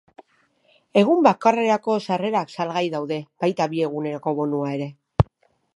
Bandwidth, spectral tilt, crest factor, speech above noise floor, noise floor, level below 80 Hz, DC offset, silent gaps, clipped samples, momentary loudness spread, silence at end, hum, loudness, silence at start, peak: 11.5 kHz; -7 dB/octave; 22 dB; 42 dB; -63 dBFS; -44 dBFS; under 0.1%; none; under 0.1%; 10 LU; 0.5 s; none; -22 LUFS; 0.95 s; 0 dBFS